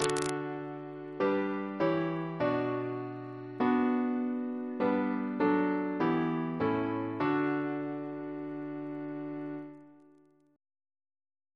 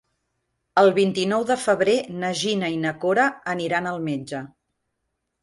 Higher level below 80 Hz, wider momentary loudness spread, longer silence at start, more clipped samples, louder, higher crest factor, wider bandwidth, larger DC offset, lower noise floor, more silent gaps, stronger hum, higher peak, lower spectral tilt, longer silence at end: about the same, -70 dBFS vs -66 dBFS; about the same, 11 LU vs 10 LU; second, 0 s vs 0.75 s; neither; second, -33 LUFS vs -22 LUFS; about the same, 22 dB vs 18 dB; about the same, 11 kHz vs 11.5 kHz; neither; second, -63 dBFS vs -78 dBFS; neither; neither; second, -10 dBFS vs -6 dBFS; first, -6 dB/octave vs -4.5 dB/octave; first, 1.6 s vs 0.95 s